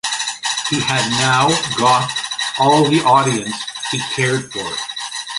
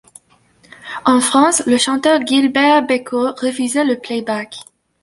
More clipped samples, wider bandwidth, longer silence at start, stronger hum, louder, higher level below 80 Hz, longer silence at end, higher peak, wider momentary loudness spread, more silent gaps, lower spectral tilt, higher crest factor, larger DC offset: neither; about the same, 11.5 kHz vs 11.5 kHz; second, 0.05 s vs 0.85 s; neither; about the same, -16 LUFS vs -15 LUFS; first, -54 dBFS vs -60 dBFS; second, 0 s vs 0.4 s; about the same, 0 dBFS vs -2 dBFS; about the same, 10 LU vs 11 LU; neither; about the same, -3 dB/octave vs -2 dB/octave; about the same, 16 dB vs 14 dB; neither